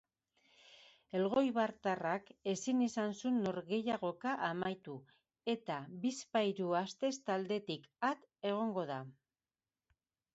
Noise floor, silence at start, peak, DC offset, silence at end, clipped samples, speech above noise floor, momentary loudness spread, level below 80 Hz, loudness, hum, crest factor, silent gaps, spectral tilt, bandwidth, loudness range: under -90 dBFS; 0.7 s; -20 dBFS; under 0.1%; 1.2 s; under 0.1%; over 53 dB; 9 LU; -80 dBFS; -38 LUFS; none; 18 dB; none; -4.5 dB/octave; 8 kHz; 3 LU